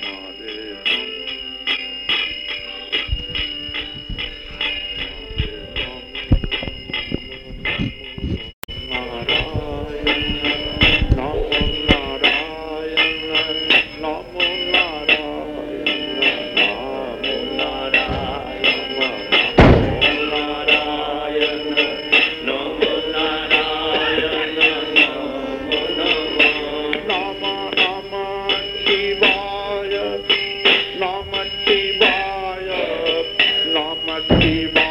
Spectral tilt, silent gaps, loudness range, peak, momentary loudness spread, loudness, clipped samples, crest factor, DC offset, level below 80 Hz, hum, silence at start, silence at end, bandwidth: -5.5 dB/octave; 8.53-8.62 s; 8 LU; -2 dBFS; 12 LU; -18 LUFS; under 0.1%; 18 dB; under 0.1%; -32 dBFS; none; 0 s; 0 s; 16 kHz